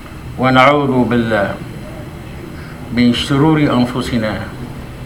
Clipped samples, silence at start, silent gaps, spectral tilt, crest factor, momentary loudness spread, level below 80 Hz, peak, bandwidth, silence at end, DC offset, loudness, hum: under 0.1%; 0 s; none; -6.5 dB/octave; 16 dB; 20 LU; -36 dBFS; 0 dBFS; 16.5 kHz; 0 s; under 0.1%; -14 LUFS; none